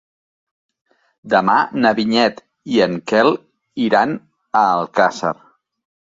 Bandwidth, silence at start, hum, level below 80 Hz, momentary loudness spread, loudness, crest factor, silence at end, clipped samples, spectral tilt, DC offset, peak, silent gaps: 7.8 kHz; 1.25 s; none; -62 dBFS; 11 LU; -17 LUFS; 16 dB; 0.8 s; under 0.1%; -5.5 dB/octave; under 0.1%; -2 dBFS; none